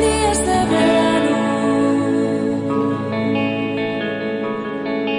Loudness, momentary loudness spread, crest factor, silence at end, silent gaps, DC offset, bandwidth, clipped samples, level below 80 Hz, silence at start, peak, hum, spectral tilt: -18 LUFS; 7 LU; 12 dB; 0 s; none; under 0.1%; 11.5 kHz; under 0.1%; -40 dBFS; 0 s; -6 dBFS; none; -5 dB/octave